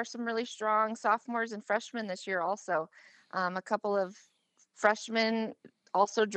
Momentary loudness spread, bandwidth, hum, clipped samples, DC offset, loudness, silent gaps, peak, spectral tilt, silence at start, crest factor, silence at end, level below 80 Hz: 8 LU; 9 kHz; none; under 0.1%; under 0.1%; -32 LUFS; none; -10 dBFS; -4 dB/octave; 0 s; 22 dB; 0 s; under -90 dBFS